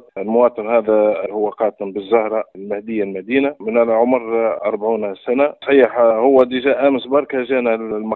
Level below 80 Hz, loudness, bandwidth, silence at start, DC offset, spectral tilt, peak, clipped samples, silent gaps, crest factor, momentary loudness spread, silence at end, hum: -60 dBFS; -17 LUFS; 4.2 kHz; 0.15 s; under 0.1%; -8.5 dB/octave; 0 dBFS; under 0.1%; none; 16 dB; 8 LU; 0 s; none